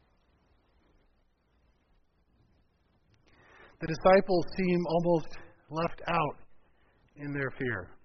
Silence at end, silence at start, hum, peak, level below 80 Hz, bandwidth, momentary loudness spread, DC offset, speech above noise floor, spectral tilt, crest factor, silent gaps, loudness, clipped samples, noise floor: 0.1 s; 3.8 s; none; -10 dBFS; -54 dBFS; 6.2 kHz; 16 LU; under 0.1%; 41 dB; -5.5 dB/octave; 24 dB; none; -30 LUFS; under 0.1%; -70 dBFS